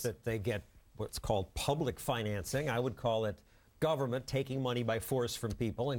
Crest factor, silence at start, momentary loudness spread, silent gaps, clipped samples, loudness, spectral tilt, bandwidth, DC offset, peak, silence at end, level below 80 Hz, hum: 16 dB; 0 s; 5 LU; none; under 0.1%; -36 LUFS; -5.5 dB/octave; 17 kHz; under 0.1%; -18 dBFS; 0 s; -54 dBFS; none